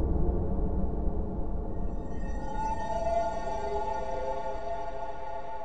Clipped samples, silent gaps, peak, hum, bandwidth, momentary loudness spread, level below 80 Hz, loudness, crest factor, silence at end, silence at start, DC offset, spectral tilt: under 0.1%; none; -16 dBFS; none; 9 kHz; 8 LU; -34 dBFS; -34 LUFS; 14 dB; 0 s; 0 s; 2%; -7.5 dB/octave